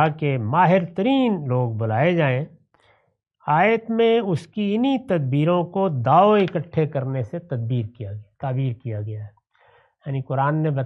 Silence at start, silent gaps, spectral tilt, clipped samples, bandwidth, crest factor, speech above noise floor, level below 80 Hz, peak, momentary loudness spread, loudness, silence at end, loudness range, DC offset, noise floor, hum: 0 s; none; -9 dB/octave; under 0.1%; 6.4 kHz; 18 dB; 40 dB; -64 dBFS; -4 dBFS; 13 LU; -21 LUFS; 0 s; 8 LU; under 0.1%; -60 dBFS; none